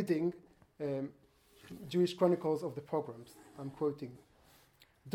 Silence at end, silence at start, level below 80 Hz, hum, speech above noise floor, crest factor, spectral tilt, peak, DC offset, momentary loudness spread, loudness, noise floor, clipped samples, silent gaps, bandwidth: 0 s; 0 s; -74 dBFS; none; 31 dB; 22 dB; -7.5 dB/octave; -16 dBFS; under 0.1%; 21 LU; -36 LUFS; -66 dBFS; under 0.1%; none; 15.5 kHz